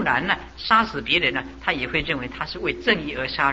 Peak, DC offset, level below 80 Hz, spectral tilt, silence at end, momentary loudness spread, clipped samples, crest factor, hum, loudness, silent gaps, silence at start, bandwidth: -4 dBFS; under 0.1%; -44 dBFS; -5 dB/octave; 0 s; 8 LU; under 0.1%; 20 dB; none; -22 LUFS; none; 0 s; 8 kHz